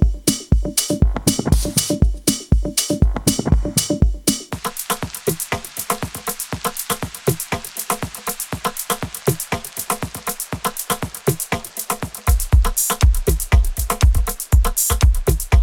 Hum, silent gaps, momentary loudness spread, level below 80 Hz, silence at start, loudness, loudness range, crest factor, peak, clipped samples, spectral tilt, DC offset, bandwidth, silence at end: none; none; 8 LU; -22 dBFS; 0 s; -20 LUFS; 6 LU; 18 dB; 0 dBFS; under 0.1%; -4 dB/octave; under 0.1%; 18.5 kHz; 0 s